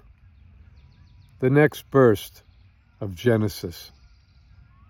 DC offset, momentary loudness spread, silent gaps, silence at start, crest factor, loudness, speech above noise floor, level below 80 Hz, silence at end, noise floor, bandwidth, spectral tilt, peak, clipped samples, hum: under 0.1%; 18 LU; none; 1.4 s; 22 dB; -21 LUFS; 34 dB; -54 dBFS; 1.05 s; -55 dBFS; 17.5 kHz; -7 dB/octave; -4 dBFS; under 0.1%; none